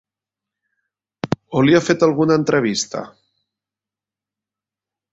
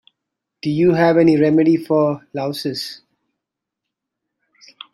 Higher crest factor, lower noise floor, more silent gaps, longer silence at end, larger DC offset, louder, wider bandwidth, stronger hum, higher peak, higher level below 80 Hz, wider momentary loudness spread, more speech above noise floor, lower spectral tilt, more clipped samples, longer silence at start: about the same, 20 dB vs 16 dB; first, -89 dBFS vs -82 dBFS; neither; about the same, 2.05 s vs 2 s; neither; about the same, -17 LUFS vs -17 LUFS; second, 8 kHz vs 14 kHz; neither; about the same, -2 dBFS vs -2 dBFS; about the same, -58 dBFS vs -60 dBFS; about the same, 12 LU vs 13 LU; first, 72 dB vs 66 dB; second, -5 dB/octave vs -7 dB/octave; neither; first, 1.25 s vs 0.65 s